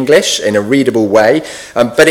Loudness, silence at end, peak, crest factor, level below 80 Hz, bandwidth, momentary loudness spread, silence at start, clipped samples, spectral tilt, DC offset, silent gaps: -11 LUFS; 0 s; 0 dBFS; 10 dB; -48 dBFS; 18 kHz; 6 LU; 0 s; 0.9%; -4 dB/octave; under 0.1%; none